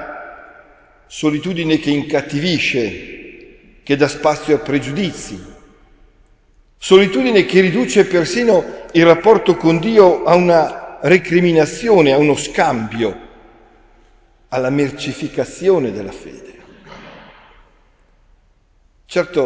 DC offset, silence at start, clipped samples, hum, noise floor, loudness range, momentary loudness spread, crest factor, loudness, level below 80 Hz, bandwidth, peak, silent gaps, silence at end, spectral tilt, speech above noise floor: under 0.1%; 0 s; under 0.1%; none; -54 dBFS; 9 LU; 18 LU; 16 dB; -15 LUFS; -46 dBFS; 8 kHz; 0 dBFS; none; 0 s; -5.5 dB/octave; 40 dB